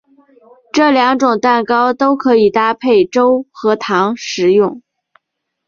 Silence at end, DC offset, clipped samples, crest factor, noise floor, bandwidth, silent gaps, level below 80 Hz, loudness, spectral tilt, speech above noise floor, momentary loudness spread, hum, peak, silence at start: 0.9 s; under 0.1%; under 0.1%; 12 dB; -74 dBFS; 7.4 kHz; none; -58 dBFS; -13 LUFS; -5 dB/octave; 61 dB; 6 LU; none; 0 dBFS; 0.75 s